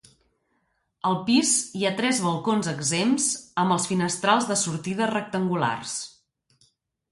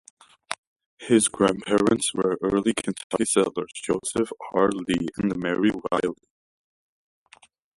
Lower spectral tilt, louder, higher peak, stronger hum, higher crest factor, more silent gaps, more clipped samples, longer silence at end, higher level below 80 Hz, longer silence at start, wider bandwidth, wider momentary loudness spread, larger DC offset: about the same, -3.5 dB/octave vs -4 dB/octave; about the same, -24 LUFS vs -24 LUFS; about the same, -6 dBFS vs -4 dBFS; neither; about the same, 20 dB vs 20 dB; second, none vs 0.58-0.76 s, 0.86-0.97 s, 3.04-3.10 s; neither; second, 1 s vs 1.6 s; second, -66 dBFS vs -56 dBFS; first, 1.05 s vs 0.5 s; about the same, 11.5 kHz vs 11.5 kHz; second, 6 LU vs 11 LU; neither